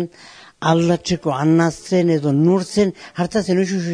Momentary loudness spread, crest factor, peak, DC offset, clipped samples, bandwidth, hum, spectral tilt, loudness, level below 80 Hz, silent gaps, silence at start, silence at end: 6 LU; 16 dB; 0 dBFS; under 0.1%; under 0.1%; 10.5 kHz; none; -6.5 dB/octave; -18 LUFS; -52 dBFS; none; 0 s; 0 s